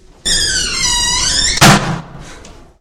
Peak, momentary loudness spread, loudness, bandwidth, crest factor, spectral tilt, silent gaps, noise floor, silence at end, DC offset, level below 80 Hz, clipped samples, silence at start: 0 dBFS; 8 LU; -11 LUFS; over 20 kHz; 14 dB; -2.5 dB/octave; none; -36 dBFS; 0.3 s; under 0.1%; -28 dBFS; 0.5%; 0.25 s